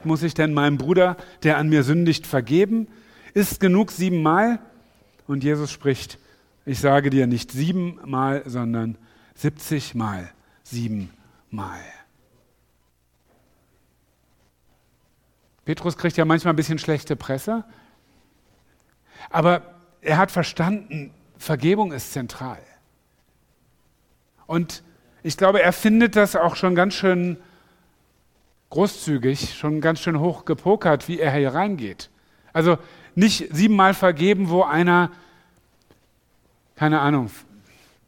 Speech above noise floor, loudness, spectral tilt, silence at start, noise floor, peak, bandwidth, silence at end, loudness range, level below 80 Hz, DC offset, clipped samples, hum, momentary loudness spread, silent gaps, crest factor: 44 dB; -21 LUFS; -6 dB/octave; 0 s; -65 dBFS; -2 dBFS; 17.5 kHz; 0.65 s; 11 LU; -54 dBFS; under 0.1%; under 0.1%; none; 16 LU; none; 20 dB